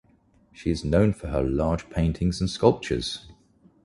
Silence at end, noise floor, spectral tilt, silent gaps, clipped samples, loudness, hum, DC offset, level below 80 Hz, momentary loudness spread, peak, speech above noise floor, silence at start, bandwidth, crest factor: 0.5 s; -60 dBFS; -6.5 dB/octave; none; under 0.1%; -25 LUFS; none; under 0.1%; -38 dBFS; 8 LU; -4 dBFS; 36 dB; 0.6 s; 11.5 kHz; 22 dB